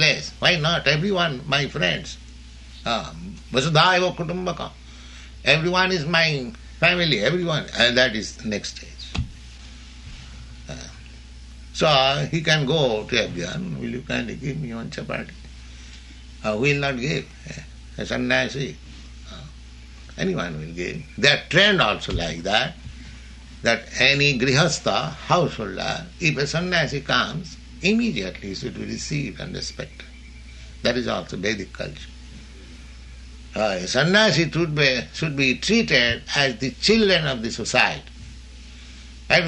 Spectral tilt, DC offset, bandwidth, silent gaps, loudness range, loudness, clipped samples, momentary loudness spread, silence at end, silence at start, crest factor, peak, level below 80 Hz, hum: -4 dB/octave; under 0.1%; 11 kHz; none; 9 LU; -21 LUFS; under 0.1%; 24 LU; 0 s; 0 s; 22 dB; -2 dBFS; -42 dBFS; none